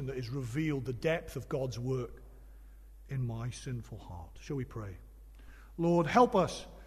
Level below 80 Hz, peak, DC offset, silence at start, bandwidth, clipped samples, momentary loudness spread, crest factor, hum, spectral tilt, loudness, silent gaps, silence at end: -52 dBFS; -12 dBFS; under 0.1%; 0 s; 13.5 kHz; under 0.1%; 20 LU; 22 dB; none; -6.5 dB/octave; -33 LUFS; none; 0 s